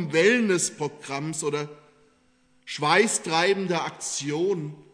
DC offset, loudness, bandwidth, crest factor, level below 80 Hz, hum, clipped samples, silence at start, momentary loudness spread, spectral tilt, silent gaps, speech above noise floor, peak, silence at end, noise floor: under 0.1%; -24 LUFS; 11 kHz; 20 dB; -76 dBFS; none; under 0.1%; 0 s; 12 LU; -3.5 dB/octave; none; 39 dB; -6 dBFS; 0.15 s; -64 dBFS